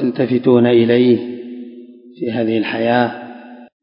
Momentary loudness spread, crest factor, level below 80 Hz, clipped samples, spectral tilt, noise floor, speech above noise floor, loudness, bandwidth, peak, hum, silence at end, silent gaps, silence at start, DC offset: 21 LU; 16 dB; -62 dBFS; under 0.1%; -12 dB/octave; -38 dBFS; 24 dB; -15 LUFS; 5.4 kHz; 0 dBFS; none; 0.2 s; none; 0 s; under 0.1%